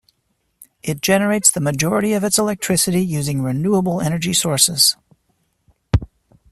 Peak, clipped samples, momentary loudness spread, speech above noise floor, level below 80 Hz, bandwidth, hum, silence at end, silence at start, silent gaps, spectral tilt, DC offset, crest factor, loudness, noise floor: 0 dBFS; under 0.1%; 8 LU; 51 dB; -40 dBFS; 15.5 kHz; none; 0.45 s; 0.6 s; none; -3.5 dB/octave; under 0.1%; 20 dB; -17 LUFS; -68 dBFS